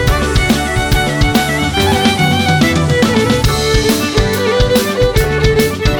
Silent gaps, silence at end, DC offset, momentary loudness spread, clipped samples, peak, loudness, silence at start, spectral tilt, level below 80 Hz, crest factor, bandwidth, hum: none; 0 s; under 0.1%; 2 LU; under 0.1%; 0 dBFS; -12 LUFS; 0 s; -5 dB/octave; -20 dBFS; 12 dB; over 20 kHz; none